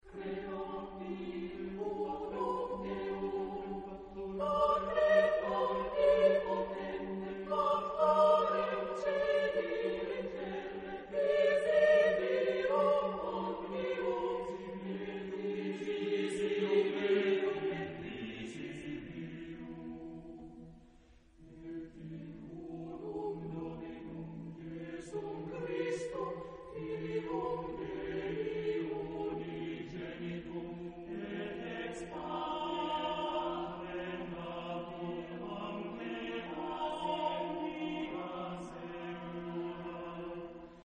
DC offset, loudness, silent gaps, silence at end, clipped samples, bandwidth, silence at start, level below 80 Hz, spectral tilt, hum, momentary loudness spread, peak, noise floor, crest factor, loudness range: under 0.1%; -36 LUFS; none; 0.1 s; under 0.1%; 10 kHz; 0.05 s; -62 dBFS; -6 dB/octave; none; 16 LU; -16 dBFS; -62 dBFS; 20 dB; 13 LU